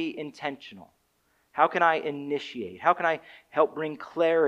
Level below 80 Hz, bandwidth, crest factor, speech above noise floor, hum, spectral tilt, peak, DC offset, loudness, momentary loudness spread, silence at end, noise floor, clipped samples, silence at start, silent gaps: -76 dBFS; 8.8 kHz; 20 dB; 43 dB; none; -5.5 dB/octave; -6 dBFS; under 0.1%; -27 LUFS; 13 LU; 0 s; -70 dBFS; under 0.1%; 0 s; none